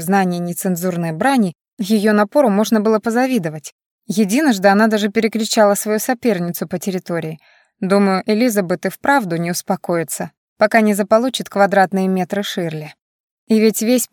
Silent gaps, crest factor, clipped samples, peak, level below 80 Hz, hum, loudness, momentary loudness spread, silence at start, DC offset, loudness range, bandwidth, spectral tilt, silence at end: 1.73-1.77 s, 3.72-3.79 s, 3.86-3.99 s, 10.37-10.56 s, 13.01-13.47 s; 16 dB; under 0.1%; -2 dBFS; -66 dBFS; none; -17 LUFS; 10 LU; 0 s; under 0.1%; 3 LU; 17.5 kHz; -5 dB/octave; 0.05 s